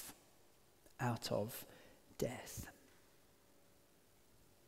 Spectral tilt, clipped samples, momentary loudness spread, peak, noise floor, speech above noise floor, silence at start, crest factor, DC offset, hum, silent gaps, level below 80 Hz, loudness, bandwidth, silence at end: -5 dB/octave; under 0.1%; 23 LU; -24 dBFS; -71 dBFS; 28 dB; 0 s; 24 dB; under 0.1%; none; none; -70 dBFS; -45 LUFS; 16 kHz; 1.8 s